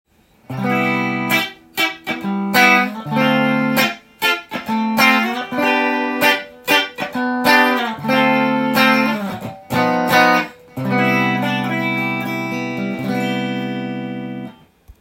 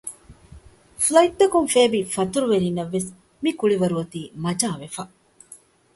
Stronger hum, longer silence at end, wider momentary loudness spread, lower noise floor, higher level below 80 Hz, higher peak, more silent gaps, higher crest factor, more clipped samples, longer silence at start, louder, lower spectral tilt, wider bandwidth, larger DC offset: neither; second, 0.1 s vs 0.4 s; second, 11 LU vs 16 LU; second, -45 dBFS vs -49 dBFS; about the same, -58 dBFS vs -56 dBFS; about the same, 0 dBFS vs -2 dBFS; neither; about the same, 18 dB vs 20 dB; neither; first, 0.5 s vs 0.05 s; first, -17 LUFS vs -21 LUFS; about the same, -4.5 dB/octave vs -4.5 dB/octave; first, 16.5 kHz vs 12 kHz; neither